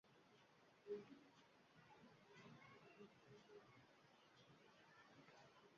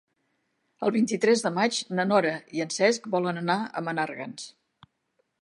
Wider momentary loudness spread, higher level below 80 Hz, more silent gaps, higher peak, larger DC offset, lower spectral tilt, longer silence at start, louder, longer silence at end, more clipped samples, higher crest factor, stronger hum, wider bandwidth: first, 13 LU vs 10 LU; second, under -90 dBFS vs -78 dBFS; neither; second, -42 dBFS vs -6 dBFS; neither; about the same, -4 dB/octave vs -4.5 dB/octave; second, 0.05 s vs 0.8 s; second, -64 LUFS vs -26 LUFS; second, 0 s vs 0.9 s; neither; about the same, 24 dB vs 20 dB; neither; second, 7 kHz vs 11.5 kHz